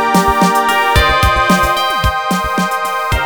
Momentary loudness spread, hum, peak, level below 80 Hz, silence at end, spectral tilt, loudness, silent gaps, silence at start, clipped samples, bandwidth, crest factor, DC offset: 5 LU; none; 0 dBFS; -24 dBFS; 0 s; -4 dB/octave; -12 LUFS; none; 0 s; under 0.1%; over 20 kHz; 12 dB; under 0.1%